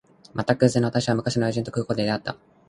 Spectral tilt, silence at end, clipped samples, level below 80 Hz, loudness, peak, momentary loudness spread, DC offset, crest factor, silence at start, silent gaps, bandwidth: -6 dB/octave; 0.35 s; under 0.1%; -54 dBFS; -24 LUFS; -4 dBFS; 9 LU; under 0.1%; 20 dB; 0.35 s; none; 11.5 kHz